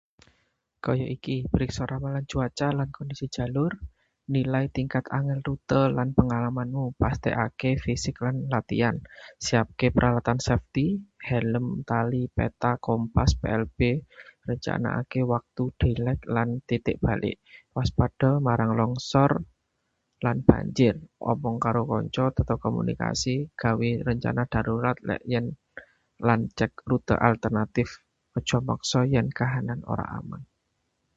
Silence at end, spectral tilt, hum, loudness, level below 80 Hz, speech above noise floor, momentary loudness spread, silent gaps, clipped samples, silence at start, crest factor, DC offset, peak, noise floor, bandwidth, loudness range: 0.7 s; -6.5 dB/octave; none; -27 LUFS; -42 dBFS; 51 dB; 9 LU; none; under 0.1%; 0.85 s; 26 dB; under 0.1%; 0 dBFS; -76 dBFS; 8 kHz; 3 LU